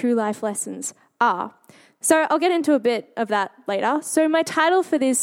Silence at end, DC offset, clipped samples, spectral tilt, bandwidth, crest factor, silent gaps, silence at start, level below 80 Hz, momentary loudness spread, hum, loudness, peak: 0 s; under 0.1%; under 0.1%; -3 dB/octave; 16.5 kHz; 18 dB; none; 0 s; -78 dBFS; 9 LU; none; -21 LUFS; -4 dBFS